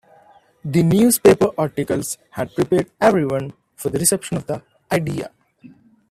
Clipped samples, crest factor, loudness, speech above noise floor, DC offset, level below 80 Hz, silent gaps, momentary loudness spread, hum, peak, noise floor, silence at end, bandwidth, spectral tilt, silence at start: under 0.1%; 20 dB; -19 LUFS; 34 dB; under 0.1%; -52 dBFS; none; 16 LU; none; 0 dBFS; -52 dBFS; 0.45 s; 16 kHz; -5 dB/octave; 0.65 s